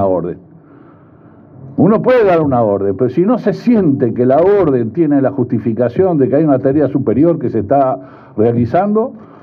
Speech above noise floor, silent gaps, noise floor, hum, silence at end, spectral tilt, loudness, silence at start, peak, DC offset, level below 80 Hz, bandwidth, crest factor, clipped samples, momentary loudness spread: 29 dB; none; -41 dBFS; none; 0.15 s; -10.5 dB/octave; -13 LUFS; 0 s; 0 dBFS; under 0.1%; -50 dBFS; 6 kHz; 12 dB; under 0.1%; 7 LU